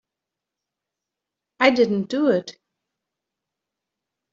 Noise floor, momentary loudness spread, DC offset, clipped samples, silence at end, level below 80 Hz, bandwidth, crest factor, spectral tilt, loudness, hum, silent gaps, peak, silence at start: -86 dBFS; 8 LU; under 0.1%; under 0.1%; 1.8 s; -70 dBFS; 7.6 kHz; 22 dB; -3.5 dB/octave; -20 LUFS; none; none; -2 dBFS; 1.6 s